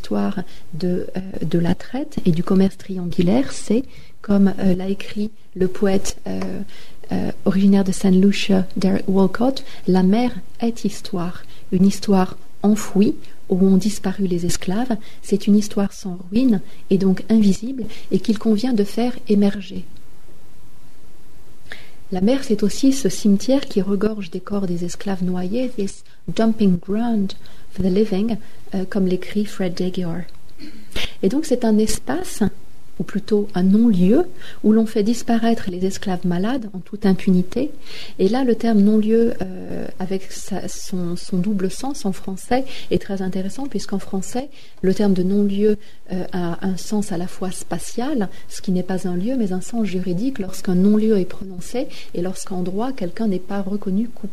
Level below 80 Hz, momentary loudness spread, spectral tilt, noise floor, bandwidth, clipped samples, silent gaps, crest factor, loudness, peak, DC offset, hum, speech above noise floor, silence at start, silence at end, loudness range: -44 dBFS; 12 LU; -6.5 dB/octave; -47 dBFS; 13.5 kHz; under 0.1%; none; 16 dB; -21 LUFS; -6 dBFS; 7%; none; 28 dB; 0.05 s; 0.05 s; 6 LU